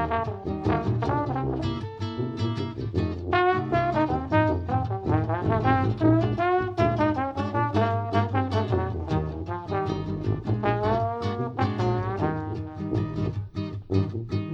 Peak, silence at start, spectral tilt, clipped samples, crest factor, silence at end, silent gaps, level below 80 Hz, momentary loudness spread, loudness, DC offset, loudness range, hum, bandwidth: -8 dBFS; 0 s; -8.5 dB/octave; under 0.1%; 18 dB; 0 s; none; -44 dBFS; 8 LU; -26 LUFS; under 0.1%; 4 LU; none; 7 kHz